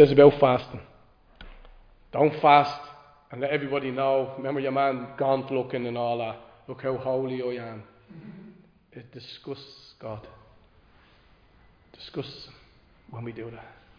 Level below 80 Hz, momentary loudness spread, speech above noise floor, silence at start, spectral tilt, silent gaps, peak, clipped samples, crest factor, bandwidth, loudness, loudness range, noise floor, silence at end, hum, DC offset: -56 dBFS; 26 LU; 33 dB; 0 s; -8 dB/octave; none; -2 dBFS; under 0.1%; 24 dB; 5.2 kHz; -25 LUFS; 19 LU; -58 dBFS; 0.3 s; none; under 0.1%